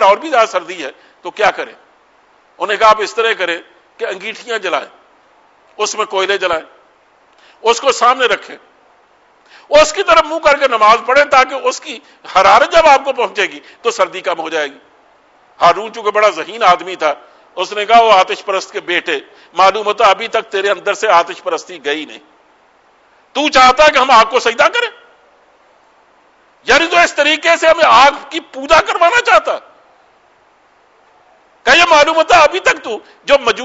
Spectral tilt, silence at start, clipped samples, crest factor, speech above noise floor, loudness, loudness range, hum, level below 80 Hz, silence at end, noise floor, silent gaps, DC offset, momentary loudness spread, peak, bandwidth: -1.5 dB/octave; 0 s; under 0.1%; 14 dB; 39 dB; -12 LUFS; 6 LU; none; -46 dBFS; 0 s; -51 dBFS; none; under 0.1%; 15 LU; 0 dBFS; 8 kHz